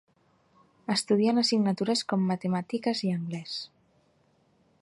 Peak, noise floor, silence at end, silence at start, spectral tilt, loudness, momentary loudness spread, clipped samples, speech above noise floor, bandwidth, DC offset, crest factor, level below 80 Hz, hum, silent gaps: -12 dBFS; -67 dBFS; 1.15 s; 0.9 s; -5 dB/octave; -28 LUFS; 13 LU; under 0.1%; 40 dB; 11.5 kHz; under 0.1%; 16 dB; -74 dBFS; none; none